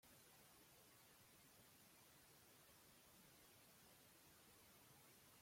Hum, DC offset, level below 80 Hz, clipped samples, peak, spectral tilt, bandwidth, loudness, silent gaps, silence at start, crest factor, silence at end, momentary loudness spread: none; under 0.1%; -90 dBFS; under 0.1%; -56 dBFS; -2.5 dB/octave; 16.5 kHz; -68 LUFS; none; 0 s; 14 dB; 0 s; 0 LU